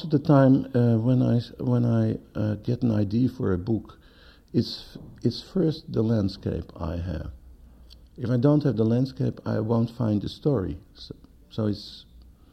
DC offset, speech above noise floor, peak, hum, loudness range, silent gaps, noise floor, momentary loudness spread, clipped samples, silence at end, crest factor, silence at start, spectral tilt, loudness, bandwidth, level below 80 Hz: under 0.1%; 28 dB; -8 dBFS; none; 5 LU; none; -52 dBFS; 14 LU; under 0.1%; 0.5 s; 18 dB; 0 s; -9 dB/octave; -25 LUFS; 8.2 kHz; -48 dBFS